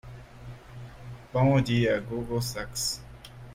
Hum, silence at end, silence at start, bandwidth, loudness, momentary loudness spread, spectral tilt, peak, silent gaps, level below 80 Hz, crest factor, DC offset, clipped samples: none; 0 s; 0.05 s; 16 kHz; -27 LUFS; 23 LU; -5.5 dB/octave; -12 dBFS; none; -50 dBFS; 18 dB; under 0.1%; under 0.1%